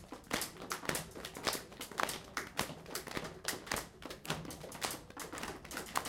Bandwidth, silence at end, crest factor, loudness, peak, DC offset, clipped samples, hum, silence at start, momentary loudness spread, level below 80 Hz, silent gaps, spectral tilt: 17 kHz; 0 s; 28 dB; -41 LUFS; -14 dBFS; under 0.1%; under 0.1%; none; 0 s; 7 LU; -62 dBFS; none; -2.5 dB/octave